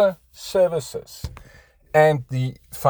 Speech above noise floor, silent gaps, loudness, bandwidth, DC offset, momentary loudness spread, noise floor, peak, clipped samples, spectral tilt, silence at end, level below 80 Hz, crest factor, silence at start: 30 dB; none; -21 LUFS; over 20 kHz; under 0.1%; 19 LU; -51 dBFS; -4 dBFS; under 0.1%; -6 dB/octave; 0 s; -46 dBFS; 18 dB; 0 s